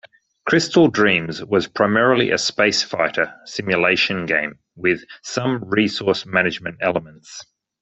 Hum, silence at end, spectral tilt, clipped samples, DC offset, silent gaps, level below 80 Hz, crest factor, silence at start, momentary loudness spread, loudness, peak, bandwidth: none; 0.4 s; -4 dB/octave; under 0.1%; under 0.1%; none; -58 dBFS; 18 dB; 0.45 s; 12 LU; -19 LUFS; -2 dBFS; 8.4 kHz